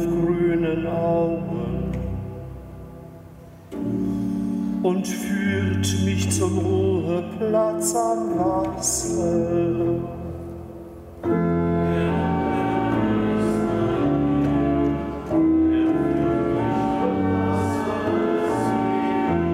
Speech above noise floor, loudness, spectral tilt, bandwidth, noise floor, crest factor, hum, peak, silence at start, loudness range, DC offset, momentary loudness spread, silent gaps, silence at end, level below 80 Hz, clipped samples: 21 dB; -22 LUFS; -6 dB/octave; 16 kHz; -43 dBFS; 14 dB; none; -8 dBFS; 0 s; 6 LU; under 0.1%; 11 LU; none; 0 s; -42 dBFS; under 0.1%